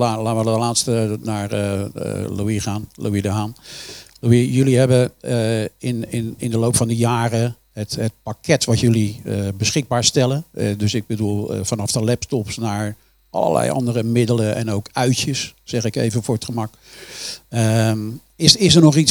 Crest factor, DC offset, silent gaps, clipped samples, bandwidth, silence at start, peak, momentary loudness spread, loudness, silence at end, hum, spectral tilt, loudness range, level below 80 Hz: 18 dB; under 0.1%; none; under 0.1%; 20 kHz; 0 s; 0 dBFS; 11 LU; -19 LUFS; 0 s; none; -5 dB/octave; 4 LU; -50 dBFS